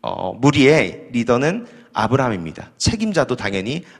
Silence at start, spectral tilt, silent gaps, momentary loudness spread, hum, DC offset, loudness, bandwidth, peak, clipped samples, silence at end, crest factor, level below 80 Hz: 0.05 s; -5.5 dB/octave; none; 13 LU; none; under 0.1%; -18 LUFS; 12 kHz; 0 dBFS; under 0.1%; 0.15 s; 18 dB; -42 dBFS